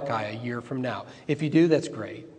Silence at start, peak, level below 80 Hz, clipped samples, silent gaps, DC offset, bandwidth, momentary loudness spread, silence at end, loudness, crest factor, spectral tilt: 0 s; -8 dBFS; -70 dBFS; under 0.1%; none; under 0.1%; 9.4 kHz; 14 LU; 0 s; -27 LUFS; 18 dB; -7 dB/octave